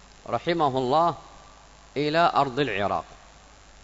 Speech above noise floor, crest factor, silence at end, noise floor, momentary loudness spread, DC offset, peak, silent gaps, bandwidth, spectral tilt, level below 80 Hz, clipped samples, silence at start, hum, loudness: 27 dB; 18 dB; 0.7 s; -51 dBFS; 12 LU; under 0.1%; -8 dBFS; none; 8 kHz; -6 dB/octave; -54 dBFS; under 0.1%; 0.3 s; none; -25 LUFS